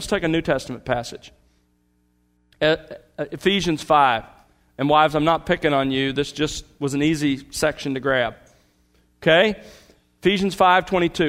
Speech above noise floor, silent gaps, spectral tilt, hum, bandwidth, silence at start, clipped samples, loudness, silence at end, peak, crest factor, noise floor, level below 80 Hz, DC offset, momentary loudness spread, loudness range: 44 dB; none; -5 dB/octave; 60 Hz at -55 dBFS; 16 kHz; 0 s; under 0.1%; -21 LUFS; 0 s; -2 dBFS; 20 dB; -64 dBFS; -48 dBFS; under 0.1%; 10 LU; 5 LU